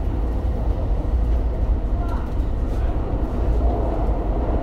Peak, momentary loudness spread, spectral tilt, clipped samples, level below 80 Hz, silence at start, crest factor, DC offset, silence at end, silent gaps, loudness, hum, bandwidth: -10 dBFS; 3 LU; -9.5 dB/octave; under 0.1%; -22 dBFS; 0 s; 10 dB; under 0.1%; 0 s; none; -24 LUFS; none; 4.6 kHz